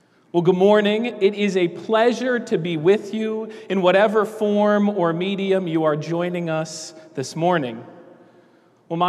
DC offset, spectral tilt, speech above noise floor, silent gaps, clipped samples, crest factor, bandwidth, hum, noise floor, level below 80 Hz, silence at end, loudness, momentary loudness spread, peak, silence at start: under 0.1%; -6 dB/octave; 35 dB; none; under 0.1%; 16 dB; 12.5 kHz; none; -55 dBFS; -78 dBFS; 0 s; -20 LUFS; 13 LU; -4 dBFS; 0.35 s